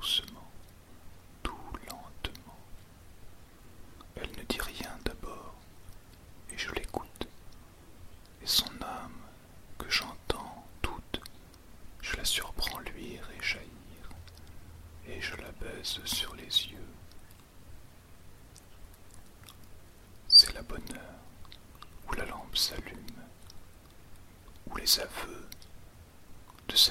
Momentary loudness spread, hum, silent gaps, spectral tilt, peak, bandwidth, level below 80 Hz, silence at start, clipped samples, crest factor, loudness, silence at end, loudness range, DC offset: 24 LU; none; none; -1.5 dB/octave; -8 dBFS; 16.5 kHz; -48 dBFS; 0 s; under 0.1%; 28 dB; -30 LUFS; 0 s; 16 LU; under 0.1%